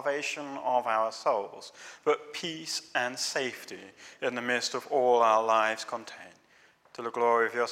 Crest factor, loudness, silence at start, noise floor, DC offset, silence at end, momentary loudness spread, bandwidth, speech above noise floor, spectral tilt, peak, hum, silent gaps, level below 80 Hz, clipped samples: 20 dB; -29 LUFS; 0 s; -62 dBFS; under 0.1%; 0 s; 21 LU; 16 kHz; 32 dB; -2 dB/octave; -10 dBFS; none; none; -84 dBFS; under 0.1%